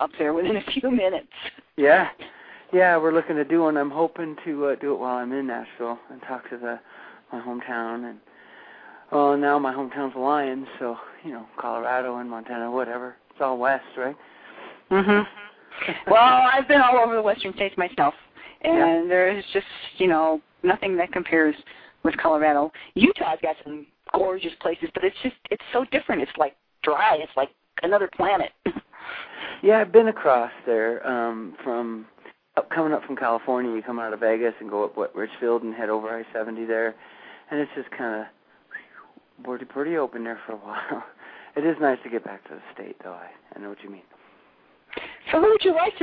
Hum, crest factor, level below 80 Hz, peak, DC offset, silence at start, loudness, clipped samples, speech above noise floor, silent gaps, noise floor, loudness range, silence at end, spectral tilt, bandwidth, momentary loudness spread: none; 24 dB; -62 dBFS; 0 dBFS; under 0.1%; 0 s; -23 LUFS; under 0.1%; 35 dB; none; -58 dBFS; 12 LU; 0 s; -8.5 dB/octave; 4.9 kHz; 19 LU